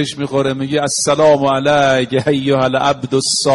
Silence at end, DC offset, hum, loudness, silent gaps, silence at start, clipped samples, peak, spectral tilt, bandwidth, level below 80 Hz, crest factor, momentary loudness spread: 0 s; under 0.1%; none; -14 LUFS; none; 0 s; under 0.1%; -2 dBFS; -4 dB/octave; 11.5 kHz; -50 dBFS; 12 dB; 6 LU